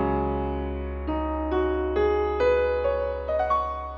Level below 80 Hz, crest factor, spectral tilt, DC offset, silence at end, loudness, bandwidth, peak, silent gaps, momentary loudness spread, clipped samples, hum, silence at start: -34 dBFS; 12 dB; -8.5 dB/octave; under 0.1%; 0 s; -26 LUFS; 7 kHz; -12 dBFS; none; 7 LU; under 0.1%; none; 0 s